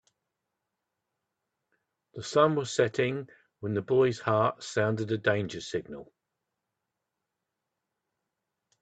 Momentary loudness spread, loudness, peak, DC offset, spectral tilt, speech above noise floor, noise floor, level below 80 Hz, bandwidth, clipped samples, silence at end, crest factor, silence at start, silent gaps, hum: 16 LU; -28 LUFS; -8 dBFS; under 0.1%; -5.5 dB/octave; 58 dB; -86 dBFS; -70 dBFS; 9 kHz; under 0.1%; 2.8 s; 24 dB; 2.15 s; none; none